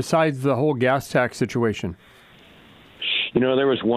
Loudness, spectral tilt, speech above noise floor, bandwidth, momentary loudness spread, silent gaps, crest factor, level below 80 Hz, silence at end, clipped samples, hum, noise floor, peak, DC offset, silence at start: -22 LUFS; -5.5 dB/octave; 28 dB; 15 kHz; 6 LU; none; 16 dB; -56 dBFS; 0 s; under 0.1%; none; -49 dBFS; -6 dBFS; under 0.1%; 0 s